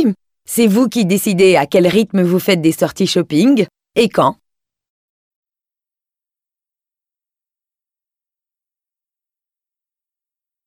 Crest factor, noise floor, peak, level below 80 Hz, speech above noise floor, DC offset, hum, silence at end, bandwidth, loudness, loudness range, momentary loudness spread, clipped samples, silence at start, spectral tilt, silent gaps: 16 dB; -90 dBFS; -2 dBFS; -58 dBFS; 77 dB; under 0.1%; none; 6.35 s; 16.5 kHz; -14 LUFS; 9 LU; 6 LU; under 0.1%; 0 s; -5.5 dB/octave; none